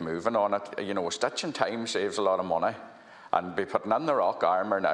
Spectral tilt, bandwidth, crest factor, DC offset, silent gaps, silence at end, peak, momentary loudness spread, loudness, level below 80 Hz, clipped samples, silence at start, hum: -4 dB/octave; 11 kHz; 20 dB; under 0.1%; none; 0 s; -8 dBFS; 6 LU; -28 LUFS; -70 dBFS; under 0.1%; 0 s; none